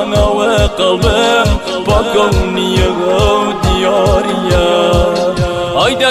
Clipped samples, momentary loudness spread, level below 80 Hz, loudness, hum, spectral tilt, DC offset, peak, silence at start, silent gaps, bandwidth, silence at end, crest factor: under 0.1%; 3 LU; -20 dBFS; -12 LUFS; none; -5 dB/octave; under 0.1%; 0 dBFS; 0 s; none; 15 kHz; 0 s; 10 dB